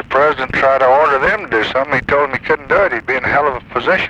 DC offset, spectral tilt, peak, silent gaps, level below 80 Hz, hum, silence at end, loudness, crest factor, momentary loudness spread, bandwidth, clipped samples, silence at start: under 0.1%; -5.5 dB/octave; -2 dBFS; none; -40 dBFS; none; 0 s; -14 LUFS; 12 dB; 5 LU; 9 kHz; under 0.1%; 0 s